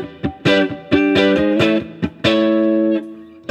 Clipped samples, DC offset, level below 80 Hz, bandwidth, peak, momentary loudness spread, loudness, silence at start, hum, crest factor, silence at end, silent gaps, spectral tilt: under 0.1%; under 0.1%; -48 dBFS; 8.6 kHz; -2 dBFS; 12 LU; -16 LUFS; 0 s; none; 16 dB; 0.25 s; none; -6.5 dB/octave